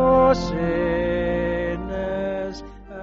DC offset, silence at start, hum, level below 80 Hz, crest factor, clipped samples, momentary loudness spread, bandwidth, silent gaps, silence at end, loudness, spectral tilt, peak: under 0.1%; 0 s; none; -36 dBFS; 16 dB; under 0.1%; 13 LU; 7.4 kHz; none; 0 s; -23 LUFS; -5.5 dB/octave; -6 dBFS